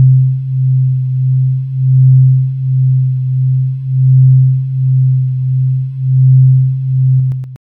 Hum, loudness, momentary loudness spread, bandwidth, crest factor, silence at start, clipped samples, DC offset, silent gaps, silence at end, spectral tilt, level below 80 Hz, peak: none; -11 LUFS; 7 LU; 0.3 kHz; 8 dB; 0 s; under 0.1%; under 0.1%; none; 0.15 s; -13 dB/octave; -46 dBFS; -2 dBFS